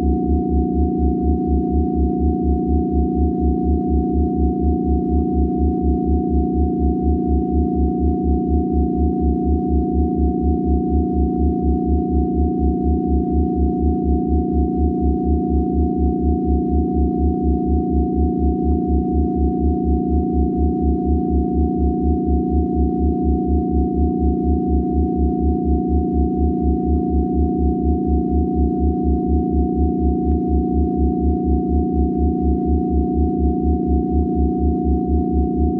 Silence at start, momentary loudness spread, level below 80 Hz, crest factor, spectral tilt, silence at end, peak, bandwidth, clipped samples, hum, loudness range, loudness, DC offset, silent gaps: 0 s; 1 LU; -22 dBFS; 12 dB; -15 dB/octave; 0 s; -6 dBFS; 0.9 kHz; under 0.1%; none; 0 LU; -19 LUFS; under 0.1%; none